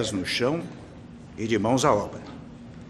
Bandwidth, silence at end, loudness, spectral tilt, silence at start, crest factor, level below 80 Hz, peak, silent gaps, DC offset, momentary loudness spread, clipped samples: 13 kHz; 0 s; -25 LUFS; -4.5 dB/octave; 0 s; 22 dB; -52 dBFS; -6 dBFS; none; under 0.1%; 22 LU; under 0.1%